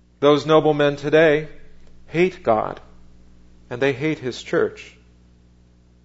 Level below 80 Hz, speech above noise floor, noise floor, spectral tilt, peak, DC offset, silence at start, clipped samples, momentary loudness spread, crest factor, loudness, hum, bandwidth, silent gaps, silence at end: -48 dBFS; 34 dB; -53 dBFS; -6.5 dB/octave; -2 dBFS; under 0.1%; 0.2 s; under 0.1%; 16 LU; 20 dB; -19 LUFS; 60 Hz at -50 dBFS; 8 kHz; none; 1.15 s